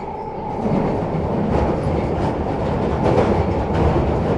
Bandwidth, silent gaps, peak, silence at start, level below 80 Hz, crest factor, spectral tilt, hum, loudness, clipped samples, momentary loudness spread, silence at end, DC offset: 10.5 kHz; none; -4 dBFS; 0 s; -30 dBFS; 14 dB; -8.5 dB/octave; none; -20 LUFS; under 0.1%; 5 LU; 0 s; under 0.1%